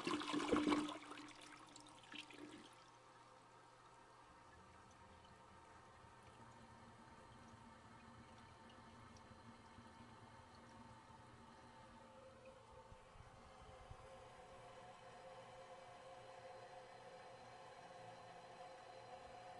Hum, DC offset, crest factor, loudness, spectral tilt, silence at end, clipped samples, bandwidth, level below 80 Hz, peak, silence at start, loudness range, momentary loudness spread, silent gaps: none; under 0.1%; 28 dB; -53 LUFS; -4.5 dB/octave; 0 s; under 0.1%; 11.5 kHz; -76 dBFS; -26 dBFS; 0 s; 7 LU; 10 LU; none